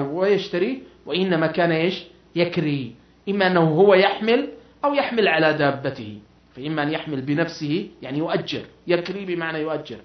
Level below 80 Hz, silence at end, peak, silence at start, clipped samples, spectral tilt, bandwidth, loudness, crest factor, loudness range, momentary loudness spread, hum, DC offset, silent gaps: -60 dBFS; 0.05 s; -4 dBFS; 0 s; under 0.1%; -7 dB/octave; 6.4 kHz; -22 LUFS; 18 dB; 6 LU; 13 LU; none; under 0.1%; none